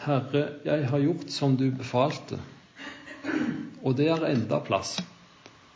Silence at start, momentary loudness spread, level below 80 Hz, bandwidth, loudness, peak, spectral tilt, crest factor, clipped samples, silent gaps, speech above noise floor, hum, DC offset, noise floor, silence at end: 0 s; 16 LU; -64 dBFS; 8 kHz; -28 LUFS; -10 dBFS; -6.5 dB/octave; 18 dB; under 0.1%; none; 27 dB; none; under 0.1%; -53 dBFS; 0.25 s